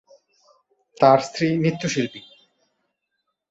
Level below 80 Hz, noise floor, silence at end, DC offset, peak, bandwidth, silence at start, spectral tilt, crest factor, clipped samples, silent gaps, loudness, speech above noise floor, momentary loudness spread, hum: -64 dBFS; -77 dBFS; 1.3 s; under 0.1%; -2 dBFS; 8 kHz; 1 s; -5.5 dB/octave; 22 dB; under 0.1%; none; -20 LUFS; 58 dB; 12 LU; none